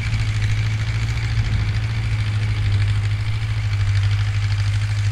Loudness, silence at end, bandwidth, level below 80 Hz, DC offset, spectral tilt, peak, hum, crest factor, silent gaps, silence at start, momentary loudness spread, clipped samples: -21 LUFS; 0 s; 9.8 kHz; -28 dBFS; under 0.1%; -5.5 dB/octave; -8 dBFS; none; 10 dB; none; 0 s; 3 LU; under 0.1%